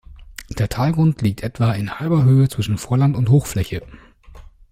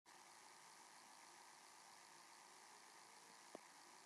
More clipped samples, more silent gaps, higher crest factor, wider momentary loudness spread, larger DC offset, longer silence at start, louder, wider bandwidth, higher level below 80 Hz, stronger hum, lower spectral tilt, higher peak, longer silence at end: neither; neither; second, 14 dB vs 24 dB; first, 13 LU vs 2 LU; neither; about the same, 0.1 s vs 0.05 s; first, -18 LUFS vs -63 LUFS; first, 15.5 kHz vs 13 kHz; first, -40 dBFS vs under -90 dBFS; neither; first, -7 dB/octave vs -0.5 dB/octave; first, -4 dBFS vs -40 dBFS; first, 0.3 s vs 0 s